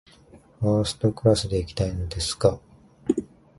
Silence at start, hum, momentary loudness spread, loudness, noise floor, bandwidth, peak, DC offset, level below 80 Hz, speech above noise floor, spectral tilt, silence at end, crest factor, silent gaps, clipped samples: 0.35 s; none; 7 LU; -25 LUFS; -52 dBFS; 11.5 kHz; -4 dBFS; under 0.1%; -40 dBFS; 29 dB; -6 dB/octave; 0.35 s; 22 dB; none; under 0.1%